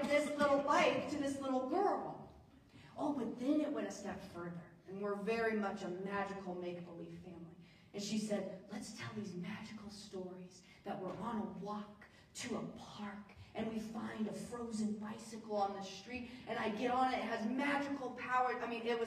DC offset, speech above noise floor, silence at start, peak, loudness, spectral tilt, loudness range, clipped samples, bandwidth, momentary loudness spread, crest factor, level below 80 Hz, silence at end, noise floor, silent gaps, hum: under 0.1%; 21 dB; 0 s; -20 dBFS; -40 LUFS; -5 dB/octave; 8 LU; under 0.1%; 15 kHz; 16 LU; 20 dB; -72 dBFS; 0 s; -61 dBFS; none; none